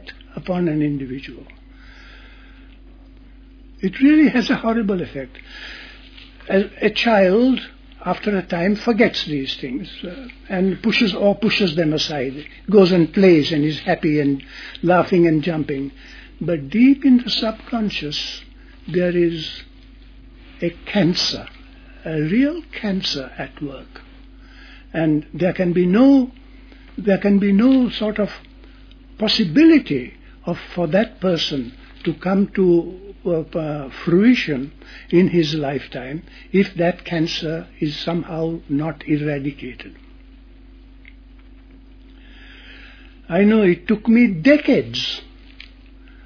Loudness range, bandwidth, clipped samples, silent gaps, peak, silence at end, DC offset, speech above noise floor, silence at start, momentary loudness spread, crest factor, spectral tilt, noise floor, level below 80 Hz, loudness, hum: 7 LU; 5.4 kHz; under 0.1%; none; -2 dBFS; 0.6 s; under 0.1%; 25 dB; 0.05 s; 17 LU; 18 dB; -6.5 dB/octave; -43 dBFS; -44 dBFS; -18 LUFS; none